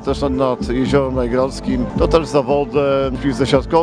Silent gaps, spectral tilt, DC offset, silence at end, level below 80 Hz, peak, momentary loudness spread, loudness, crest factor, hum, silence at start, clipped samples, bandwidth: none; -6.5 dB/octave; under 0.1%; 0 s; -30 dBFS; 0 dBFS; 4 LU; -17 LUFS; 16 dB; none; 0 s; under 0.1%; 10.5 kHz